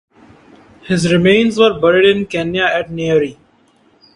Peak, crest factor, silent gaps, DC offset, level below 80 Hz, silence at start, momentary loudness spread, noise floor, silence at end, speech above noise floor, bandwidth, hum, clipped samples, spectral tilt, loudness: 0 dBFS; 16 dB; none; under 0.1%; -48 dBFS; 0.85 s; 8 LU; -53 dBFS; 0.85 s; 40 dB; 11.5 kHz; none; under 0.1%; -5.5 dB/octave; -13 LUFS